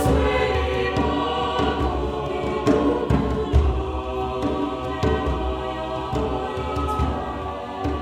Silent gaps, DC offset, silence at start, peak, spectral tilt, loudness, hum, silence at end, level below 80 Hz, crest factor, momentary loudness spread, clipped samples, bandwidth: none; under 0.1%; 0 s; -6 dBFS; -7 dB/octave; -23 LUFS; none; 0 s; -28 dBFS; 18 dB; 7 LU; under 0.1%; 14 kHz